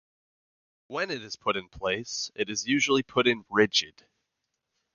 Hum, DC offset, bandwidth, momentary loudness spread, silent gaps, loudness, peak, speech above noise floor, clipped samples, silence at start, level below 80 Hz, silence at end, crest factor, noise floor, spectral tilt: none; under 0.1%; 7.4 kHz; 10 LU; none; -27 LUFS; -6 dBFS; 54 dB; under 0.1%; 0.9 s; -62 dBFS; 1.05 s; 22 dB; -82 dBFS; -3 dB/octave